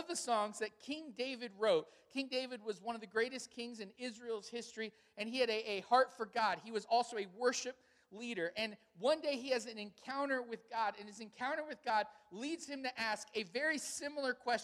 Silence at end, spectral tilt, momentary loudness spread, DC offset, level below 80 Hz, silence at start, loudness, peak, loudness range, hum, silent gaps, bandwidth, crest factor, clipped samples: 0 s; -2.5 dB/octave; 11 LU; under 0.1%; -86 dBFS; 0 s; -39 LUFS; -18 dBFS; 4 LU; none; none; 14 kHz; 22 dB; under 0.1%